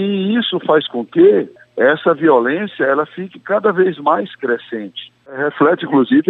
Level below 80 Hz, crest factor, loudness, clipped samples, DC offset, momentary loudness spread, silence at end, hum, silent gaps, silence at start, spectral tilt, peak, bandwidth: -66 dBFS; 14 dB; -15 LUFS; under 0.1%; under 0.1%; 14 LU; 0.1 s; none; none; 0 s; -8.5 dB/octave; -2 dBFS; 4.2 kHz